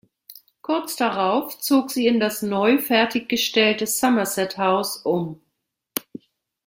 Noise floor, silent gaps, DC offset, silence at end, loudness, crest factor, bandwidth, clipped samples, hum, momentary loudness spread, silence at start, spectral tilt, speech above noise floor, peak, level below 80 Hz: -77 dBFS; none; under 0.1%; 0.65 s; -21 LUFS; 22 dB; 17 kHz; under 0.1%; none; 11 LU; 0.3 s; -3.5 dB/octave; 56 dB; -2 dBFS; -66 dBFS